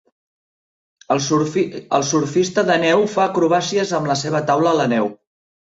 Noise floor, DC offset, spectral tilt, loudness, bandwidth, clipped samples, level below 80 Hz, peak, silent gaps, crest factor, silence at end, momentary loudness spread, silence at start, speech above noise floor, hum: under -90 dBFS; under 0.1%; -4.5 dB/octave; -18 LUFS; 8 kHz; under 0.1%; -60 dBFS; -4 dBFS; none; 16 dB; 0.55 s; 5 LU; 1.1 s; over 73 dB; none